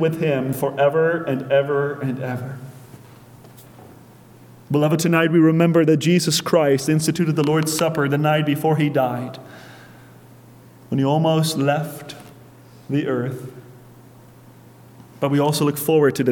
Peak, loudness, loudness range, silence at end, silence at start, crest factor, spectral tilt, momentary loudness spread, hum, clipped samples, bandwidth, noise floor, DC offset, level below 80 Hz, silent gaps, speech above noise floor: -4 dBFS; -19 LUFS; 9 LU; 0 s; 0 s; 16 dB; -5.5 dB/octave; 16 LU; none; under 0.1%; 19 kHz; -46 dBFS; under 0.1%; -62 dBFS; none; 27 dB